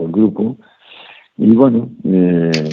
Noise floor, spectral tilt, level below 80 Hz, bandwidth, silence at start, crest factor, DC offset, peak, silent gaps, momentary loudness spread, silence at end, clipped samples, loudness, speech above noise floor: -40 dBFS; -8 dB/octave; -54 dBFS; 7.2 kHz; 0 s; 14 dB; under 0.1%; 0 dBFS; none; 11 LU; 0 s; under 0.1%; -14 LUFS; 28 dB